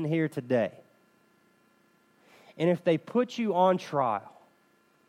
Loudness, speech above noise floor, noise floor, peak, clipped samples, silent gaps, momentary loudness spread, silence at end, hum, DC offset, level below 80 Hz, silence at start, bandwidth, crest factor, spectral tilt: -28 LUFS; 39 dB; -66 dBFS; -10 dBFS; under 0.1%; none; 5 LU; 0.8 s; none; under 0.1%; -82 dBFS; 0 s; 13 kHz; 20 dB; -7 dB/octave